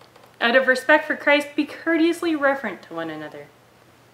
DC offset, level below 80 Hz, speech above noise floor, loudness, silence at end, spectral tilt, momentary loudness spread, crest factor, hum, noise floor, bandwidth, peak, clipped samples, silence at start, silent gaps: under 0.1%; -72 dBFS; 32 dB; -20 LUFS; 0.7 s; -3.5 dB/octave; 14 LU; 20 dB; none; -53 dBFS; 15.5 kHz; -2 dBFS; under 0.1%; 0.4 s; none